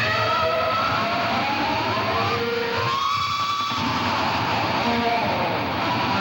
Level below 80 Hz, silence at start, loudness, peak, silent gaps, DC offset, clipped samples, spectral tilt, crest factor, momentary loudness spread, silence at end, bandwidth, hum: -50 dBFS; 0 s; -22 LUFS; -10 dBFS; none; under 0.1%; under 0.1%; -4.5 dB/octave; 12 dB; 2 LU; 0 s; 18 kHz; none